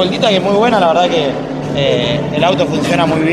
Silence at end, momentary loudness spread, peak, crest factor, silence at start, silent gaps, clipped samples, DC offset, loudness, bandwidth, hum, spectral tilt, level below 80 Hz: 0 s; 5 LU; 0 dBFS; 12 dB; 0 s; none; under 0.1%; under 0.1%; -13 LUFS; 13.5 kHz; none; -5.5 dB/octave; -42 dBFS